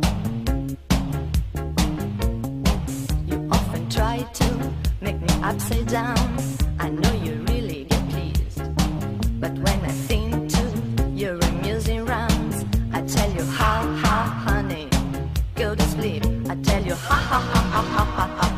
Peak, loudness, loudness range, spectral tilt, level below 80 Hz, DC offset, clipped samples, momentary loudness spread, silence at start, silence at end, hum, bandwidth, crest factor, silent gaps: -6 dBFS; -23 LUFS; 2 LU; -5.5 dB/octave; -28 dBFS; under 0.1%; under 0.1%; 5 LU; 0 s; 0 s; none; 15.5 kHz; 16 dB; none